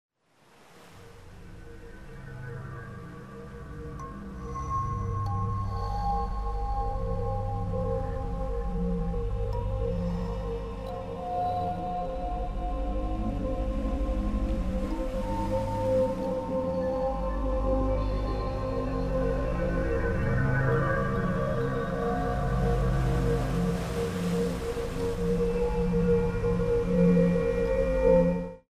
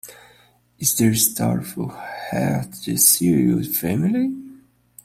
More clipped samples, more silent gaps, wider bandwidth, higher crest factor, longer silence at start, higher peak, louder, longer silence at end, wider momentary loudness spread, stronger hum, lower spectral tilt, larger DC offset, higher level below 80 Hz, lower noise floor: neither; neither; second, 13 kHz vs 16 kHz; about the same, 18 dB vs 20 dB; first, 0.75 s vs 0.05 s; second, -12 dBFS vs 0 dBFS; second, -29 LUFS vs -19 LUFS; second, 0.15 s vs 0.5 s; about the same, 14 LU vs 15 LU; second, none vs 60 Hz at -45 dBFS; first, -8 dB/octave vs -4 dB/octave; first, 0.1% vs under 0.1%; first, -34 dBFS vs -54 dBFS; first, -61 dBFS vs -55 dBFS